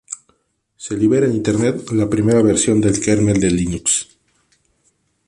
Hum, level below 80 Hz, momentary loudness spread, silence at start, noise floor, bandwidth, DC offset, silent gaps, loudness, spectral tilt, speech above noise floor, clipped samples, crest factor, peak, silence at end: none; -42 dBFS; 14 LU; 0.1 s; -64 dBFS; 11.5 kHz; under 0.1%; none; -16 LUFS; -5 dB/octave; 48 dB; under 0.1%; 16 dB; -2 dBFS; 1.25 s